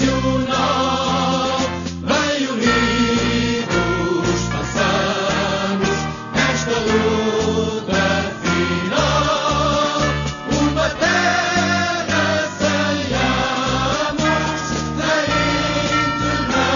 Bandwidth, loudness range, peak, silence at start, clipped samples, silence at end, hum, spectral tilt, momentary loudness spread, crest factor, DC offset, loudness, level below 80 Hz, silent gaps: 7.4 kHz; 1 LU; -4 dBFS; 0 s; under 0.1%; 0 s; none; -4.5 dB/octave; 4 LU; 16 dB; under 0.1%; -18 LUFS; -36 dBFS; none